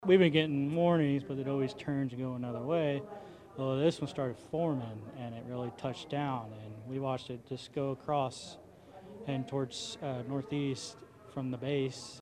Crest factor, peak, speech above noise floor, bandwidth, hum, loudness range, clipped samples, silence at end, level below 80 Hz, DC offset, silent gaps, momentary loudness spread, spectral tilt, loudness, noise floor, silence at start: 22 dB; -12 dBFS; 20 dB; 11.5 kHz; none; 5 LU; under 0.1%; 0 s; -70 dBFS; under 0.1%; none; 16 LU; -6.5 dB/octave; -34 LUFS; -53 dBFS; 0 s